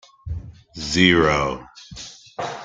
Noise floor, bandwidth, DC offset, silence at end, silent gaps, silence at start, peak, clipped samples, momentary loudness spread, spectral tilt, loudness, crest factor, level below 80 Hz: -40 dBFS; 9.4 kHz; under 0.1%; 0 s; none; 0.25 s; -2 dBFS; under 0.1%; 22 LU; -4.5 dB/octave; -18 LUFS; 22 dB; -42 dBFS